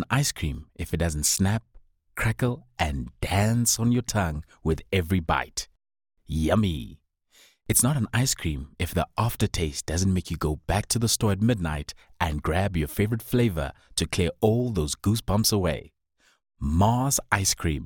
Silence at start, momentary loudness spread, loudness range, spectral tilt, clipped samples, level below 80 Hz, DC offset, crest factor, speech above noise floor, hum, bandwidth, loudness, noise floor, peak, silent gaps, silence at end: 0 s; 10 LU; 2 LU; -4.5 dB/octave; under 0.1%; -40 dBFS; under 0.1%; 20 dB; 34 dB; none; 19.5 kHz; -26 LUFS; -59 dBFS; -6 dBFS; none; 0 s